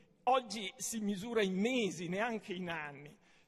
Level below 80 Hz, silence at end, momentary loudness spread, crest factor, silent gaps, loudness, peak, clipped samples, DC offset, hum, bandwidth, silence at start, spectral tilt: -74 dBFS; 0.35 s; 9 LU; 18 dB; none; -36 LUFS; -20 dBFS; under 0.1%; under 0.1%; none; 13 kHz; 0.25 s; -4 dB/octave